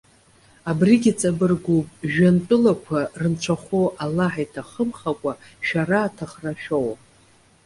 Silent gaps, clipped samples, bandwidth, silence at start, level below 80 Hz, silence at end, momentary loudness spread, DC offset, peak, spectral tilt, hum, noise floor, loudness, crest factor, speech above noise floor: none; under 0.1%; 11.5 kHz; 0.65 s; -54 dBFS; 0.7 s; 12 LU; under 0.1%; -4 dBFS; -6.5 dB/octave; none; -55 dBFS; -22 LUFS; 18 dB; 34 dB